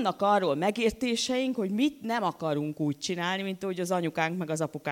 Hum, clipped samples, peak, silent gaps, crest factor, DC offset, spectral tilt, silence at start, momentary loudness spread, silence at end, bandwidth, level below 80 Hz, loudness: none; under 0.1%; -12 dBFS; none; 16 dB; under 0.1%; -4.5 dB/octave; 0 s; 6 LU; 0 s; 17 kHz; -60 dBFS; -29 LUFS